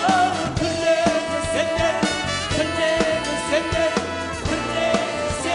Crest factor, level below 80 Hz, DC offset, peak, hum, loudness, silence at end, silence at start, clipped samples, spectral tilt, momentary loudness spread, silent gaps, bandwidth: 16 dB; -40 dBFS; under 0.1%; -4 dBFS; none; -21 LUFS; 0 s; 0 s; under 0.1%; -4 dB/octave; 5 LU; none; 11 kHz